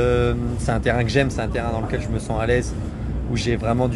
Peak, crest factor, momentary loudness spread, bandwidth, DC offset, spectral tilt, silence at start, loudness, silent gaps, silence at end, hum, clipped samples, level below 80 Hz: -4 dBFS; 18 dB; 7 LU; 11.5 kHz; under 0.1%; -6.5 dB/octave; 0 s; -22 LUFS; none; 0 s; none; under 0.1%; -30 dBFS